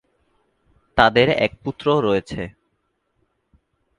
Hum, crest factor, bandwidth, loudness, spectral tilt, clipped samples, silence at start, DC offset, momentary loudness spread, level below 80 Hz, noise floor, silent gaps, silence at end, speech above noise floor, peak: none; 22 dB; 10.5 kHz; -19 LUFS; -6 dB/octave; under 0.1%; 0.95 s; under 0.1%; 17 LU; -46 dBFS; -71 dBFS; none; 1.5 s; 52 dB; 0 dBFS